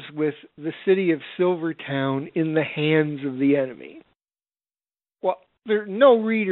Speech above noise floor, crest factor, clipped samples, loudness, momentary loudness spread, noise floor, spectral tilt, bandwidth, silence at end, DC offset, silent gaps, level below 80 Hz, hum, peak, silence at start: over 68 dB; 20 dB; under 0.1%; -22 LUFS; 11 LU; under -90 dBFS; -5 dB/octave; 4.2 kHz; 0 s; under 0.1%; none; -72 dBFS; none; -4 dBFS; 0 s